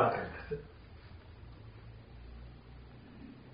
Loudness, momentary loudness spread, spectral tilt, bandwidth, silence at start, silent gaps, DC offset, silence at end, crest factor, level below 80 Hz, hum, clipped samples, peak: -45 LUFS; 13 LU; -5.5 dB/octave; 5 kHz; 0 s; none; under 0.1%; 0 s; 26 dB; -56 dBFS; none; under 0.1%; -16 dBFS